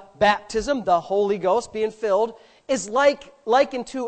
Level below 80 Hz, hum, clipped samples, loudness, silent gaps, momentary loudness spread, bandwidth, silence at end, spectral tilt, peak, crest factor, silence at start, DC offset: -52 dBFS; none; under 0.1%; -22 LUFS; none; 7 LU; 9 kHz; 0 s; -4 dB/octave; -6 dBFS; 16 dB; 0.2 s; under 0.1%